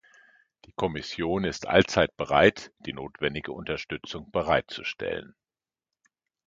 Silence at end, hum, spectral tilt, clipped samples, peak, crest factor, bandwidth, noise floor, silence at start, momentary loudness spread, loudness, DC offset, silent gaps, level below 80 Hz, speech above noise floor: 1.25 s; none; -5 dB/octave; under 0.1%; -4 dBFS; 26 dB; 7.8 kHz; under -90 dBFS; 0.8 s; 16 LU; -27 LUFS; under 0.1%; none; -52 dBFS; over 63 dB